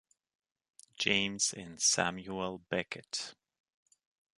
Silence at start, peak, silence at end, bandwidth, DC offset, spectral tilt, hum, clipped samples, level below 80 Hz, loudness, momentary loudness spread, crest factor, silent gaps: 1 s; -12 dBFS; 1.05 s; 11.5 kHz; under 0.1%; -1.5 dB/octave; none; under 0.1%; -68 dBFS; -32 LUFS; 11 LU; 26 dB; none